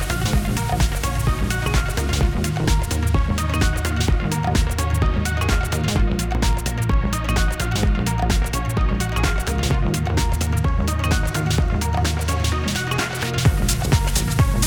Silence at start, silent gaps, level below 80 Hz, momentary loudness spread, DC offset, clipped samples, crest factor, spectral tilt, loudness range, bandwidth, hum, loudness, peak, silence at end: 0 s; none; -22 dBFS; 2 LU; under 0.1%; under 0.1%; 14 dB; -5 dB/octave; 1 LU; 19 kHz; none; -21 LUFS; -4 dBFS; 0 s